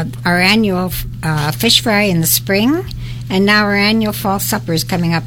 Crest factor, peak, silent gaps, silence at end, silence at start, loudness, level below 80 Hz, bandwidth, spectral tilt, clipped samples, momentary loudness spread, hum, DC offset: 14 dB; 0 dBFS; none; 0 s; 0 s; -14 LUFS; -34 dBFS; 18 kHz; -4 dB/octave; under 0.1%; 9 LU; none; under 0.1%